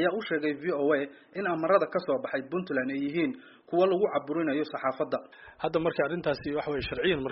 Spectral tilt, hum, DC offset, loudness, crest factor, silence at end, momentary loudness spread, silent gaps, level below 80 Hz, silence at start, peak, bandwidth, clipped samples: -4 dB/octave; none; under 0.1%; -29 LUFS; 18 dB; 0 s; 7 LU; none; -60 dBFS; 0 s; -10 dBFS; 5.8 kHz; under 0.1%